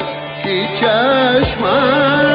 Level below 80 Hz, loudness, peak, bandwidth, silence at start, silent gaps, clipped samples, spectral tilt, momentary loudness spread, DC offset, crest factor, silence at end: -38 dBFS; -14 LUFS; -2 dBFS; 5.2 kHz; 0 s; none; under 0.1%; -2.5 dB/octave; 8 LU; under 0.1%; 12 dB; 0 s